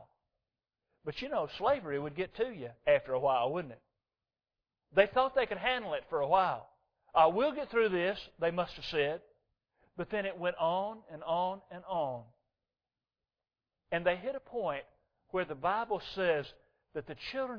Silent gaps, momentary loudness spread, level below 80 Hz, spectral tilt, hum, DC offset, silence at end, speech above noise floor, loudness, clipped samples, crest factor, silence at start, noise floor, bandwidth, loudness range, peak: none; 13 LU; -64 dBFS; -6.5 dB/octave; none; under 0.1%; 0 s; over 57 dB; -33 LUFS; under 0.1%; 24 dB; 0 s; under -90 dBFS; 5.4 kHz; 7 LU; -12 dBFS